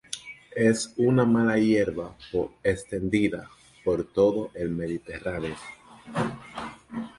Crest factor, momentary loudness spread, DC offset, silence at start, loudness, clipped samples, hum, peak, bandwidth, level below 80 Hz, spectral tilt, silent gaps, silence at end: 18 dB; 16 LU; under 0.1%; 0.1 s; -26 LUFS; under 0.1%; none; -10 dBFS; 11.5 kHz; -52 dBFS; -6 dB/octave; none; 0.1 s